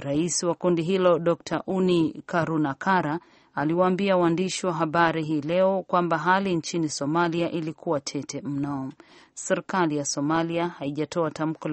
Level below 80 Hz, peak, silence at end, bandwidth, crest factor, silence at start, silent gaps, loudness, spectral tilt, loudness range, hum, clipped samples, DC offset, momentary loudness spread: -64 dBFS; -6 dBFS; 0 s; 8.8 kHz; 18 dB; 0 s; none; -25 LUFS; -5 dB/octave; 4 LU; none; under 0.1%; under 0.1%; 9 LU